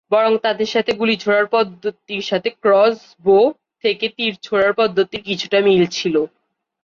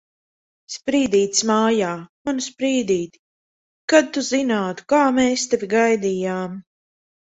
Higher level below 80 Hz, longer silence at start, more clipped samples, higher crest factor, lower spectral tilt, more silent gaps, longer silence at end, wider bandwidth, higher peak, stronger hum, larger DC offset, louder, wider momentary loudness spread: about the same, -60 dBFS vs -60 dBFS; second, 0.1 s vs 0.7 s; neither; second, 14 dB vs 20 dB; first, -5 dB/octave vs -3.5 dB/octave; second, none vs 2.09-2.25 s, 3.19-3.88 s; about the same, 0.55 s vs 0.6 s; second, 7.4 kHz vs 8.4 kHz; second, -4 dBFS vs 0 dBFS; neither; neither; first, -17 LUFS vs -20 LUFS; second, 8 LU vs 12 LU